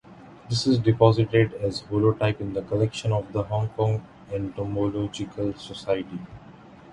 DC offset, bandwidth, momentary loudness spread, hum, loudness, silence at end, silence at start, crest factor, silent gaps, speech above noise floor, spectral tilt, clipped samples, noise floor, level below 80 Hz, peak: under 0.1%; 10.5 kHz; 12 LU; none; -25 LUFS; 0 s; 0.1 s; 22 dB; none; 23 dB; -7 dB/octave; under 0.1%; -47 dBFS; -50 dBFS; -2 dBFS